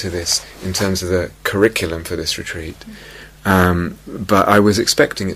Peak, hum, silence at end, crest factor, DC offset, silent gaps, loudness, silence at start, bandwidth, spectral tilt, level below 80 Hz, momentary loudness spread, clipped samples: 0 dBFS; none; 0 s; 18 dB; under 0.1%; none; -17 LUFS; 0 s; 16 kHz; -4 dB/octave; -40 dBFS; 17 LU; under 0.1%